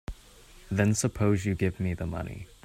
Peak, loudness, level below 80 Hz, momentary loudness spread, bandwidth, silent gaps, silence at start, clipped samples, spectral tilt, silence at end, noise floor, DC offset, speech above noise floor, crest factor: -10 dBFS; -28 LUFS; -48 dBFS; 11 LU; 15 kHz; none; 0.1 s; under 0.1%; -6 dB/octave; 0.2 s; -53 dBFS; under 0.1%; 25 dB; 20 dB